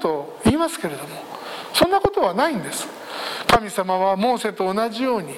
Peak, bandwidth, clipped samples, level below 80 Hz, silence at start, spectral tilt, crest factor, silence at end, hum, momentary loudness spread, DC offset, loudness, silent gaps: -2 dBFS; 17 kHz; under 0.1%; -46 dBFS; 0 s; -4 dB/octave; 18 dB; 0 s; none; 13 LU; under 0.1%; -21 LUFS; none